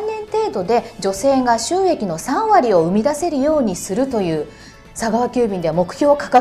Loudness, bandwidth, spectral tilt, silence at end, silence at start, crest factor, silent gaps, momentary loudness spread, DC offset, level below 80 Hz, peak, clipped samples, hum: -18 LUFS; 15 kHz; -5 dB/octave; 0 s; 0 s; 16 dB; none; 8 LU; under 0.1%; -46 dBFS; -2 dBFS; under 0.1%; none